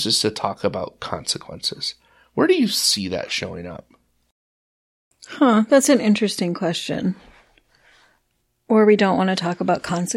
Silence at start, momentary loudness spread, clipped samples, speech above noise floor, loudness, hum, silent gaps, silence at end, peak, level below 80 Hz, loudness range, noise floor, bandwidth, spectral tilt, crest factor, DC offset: 0 s; 14 LU; under 0.1%; 50 dB; -20 LUFS; none; 4.31-5.11 s; 0 s; -4 dBFS; -58 dBFS; 3 LU; -69 dBFS; 16.5 kHz; -4 dB/octave; 18 dB; under 0.1%